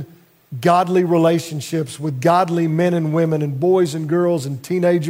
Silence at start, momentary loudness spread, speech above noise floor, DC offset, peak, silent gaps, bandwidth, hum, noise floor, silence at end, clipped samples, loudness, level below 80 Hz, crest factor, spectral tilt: 0 s; 8 LU; 25 dB; under 0.1%; -4 dBFS; none; 16 kHz; none; -42 dBFS; 0 s; under 0.1%; -18 LUFS; -66 dBFS; 14 dB; -7 dB/octave